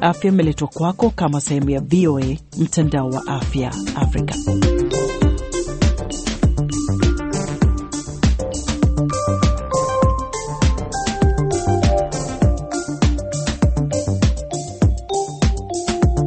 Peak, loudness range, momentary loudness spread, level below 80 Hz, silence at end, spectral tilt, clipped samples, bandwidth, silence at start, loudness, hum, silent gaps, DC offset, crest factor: -2 dBFS; 1 LU; 6 LU; -24 dBFS; 0 s; -6 dB/octave; under 0.1%; 8.8 kHz; 0 s; -19 LUFS; none; none; under 0.1%; 16 dB